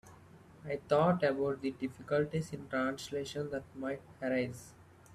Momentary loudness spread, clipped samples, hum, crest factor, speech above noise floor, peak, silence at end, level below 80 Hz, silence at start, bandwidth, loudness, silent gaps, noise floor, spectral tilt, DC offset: 12 LU; under 0.1%; none; 18 dB; 23 dB; -16 dBFS; 0 s; -68 dBFS; 0.05 s; 14 kHz; -35 LUFS; none; -57 dBFS; -6.5 dB/octave; under 0.1%